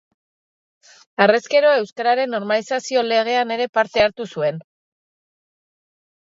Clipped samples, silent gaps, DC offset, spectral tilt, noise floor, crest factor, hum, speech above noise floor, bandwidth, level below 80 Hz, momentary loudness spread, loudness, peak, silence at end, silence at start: under 0.1%; 3.69-3.73 s; under 0.1%; -4 dB/octave; under -90 dBFS; 20 dB; none; over 72 dB; 7.8 kHz; -58 dBFS; 8 LU; -19 LUFS; 0 dBFS; 1.75 s; 1.2 s